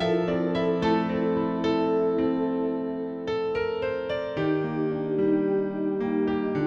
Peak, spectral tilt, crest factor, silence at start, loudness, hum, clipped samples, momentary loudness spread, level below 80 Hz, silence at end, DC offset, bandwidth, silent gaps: -12 dBFS; -8 dB/octave; 14 dB; 0 s; -26 LUFS; none; under 0.1%; 5 LU; -56 dBFS; 0 s; under 0.1%; 7.4 kHz; none